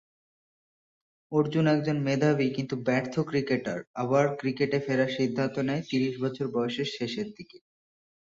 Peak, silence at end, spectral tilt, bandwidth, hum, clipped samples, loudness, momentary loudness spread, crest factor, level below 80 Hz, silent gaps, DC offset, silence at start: -12 dBFS; 0.8 s; -6.5 dB/octave; 7.8 kHz; none; under 0.1%; -28 LUFS; 7 LU; 18 dB; -68 dBFS; 3.87-3.94 s; under 0.1%; 1.3 s